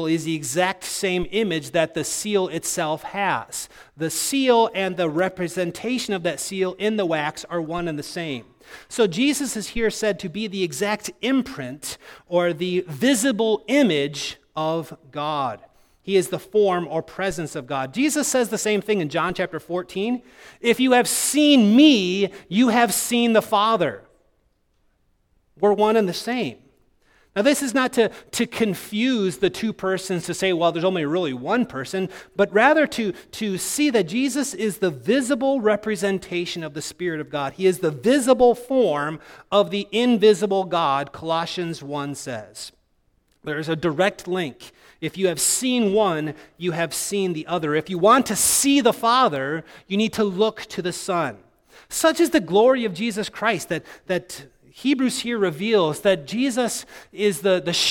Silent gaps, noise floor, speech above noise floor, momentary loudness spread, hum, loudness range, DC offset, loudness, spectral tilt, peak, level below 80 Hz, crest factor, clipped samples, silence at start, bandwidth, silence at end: none; -65 dBFS; 44 dB; 12 LU; none; 6 LU; under 0.1%; -22 LUFS; -4 dB/octave; -2 dBFS; -56 dBFS; 20 dB; under 0.1%; 0 s; 18.5 kHz; 0 s